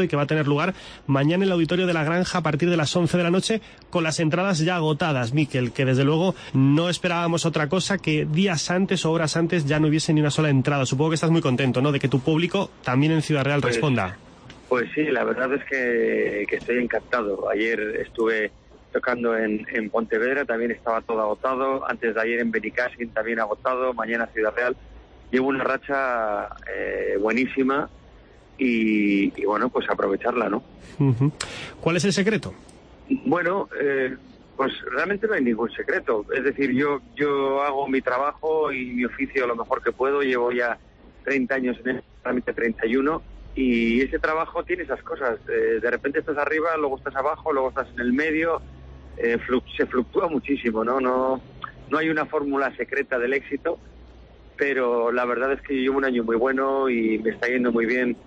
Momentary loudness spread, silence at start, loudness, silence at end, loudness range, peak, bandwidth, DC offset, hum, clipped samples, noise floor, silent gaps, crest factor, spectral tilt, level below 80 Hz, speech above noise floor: 6 LU; 0 s; -23 LUFS; 0.05 s; 3 LU; -8 dBFS; 10.5 kHz; under 0.1%; none; under 0.1%; -49 dBFS; none; 14 dB; -6 dB/octave; -52 dBFS; 26 dB